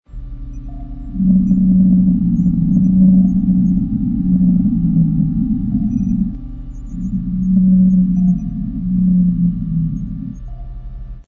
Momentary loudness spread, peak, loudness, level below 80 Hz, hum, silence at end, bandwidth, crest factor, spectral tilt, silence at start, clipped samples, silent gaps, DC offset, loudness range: 20 LU; -2 dBFS; -15 LUFS; -28 dBFS; none; 0.05 s; 1.2 kHz; 12 dB; -12.5 dB/octave; 0.1 s; under 0.1%; none; under 0.1%; 4 LU